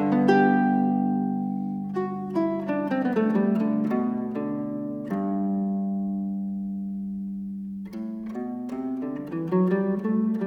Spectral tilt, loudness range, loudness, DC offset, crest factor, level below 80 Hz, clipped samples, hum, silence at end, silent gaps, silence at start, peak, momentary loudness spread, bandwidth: -9.5 dB/octave; 7 LU; -26 LUFS; under 0.1%; 18 dB; -62 dBFS; under 0.1%; none; 0 s; none; 0 s; -8 dBFS; 11 LU; 6.4 kHz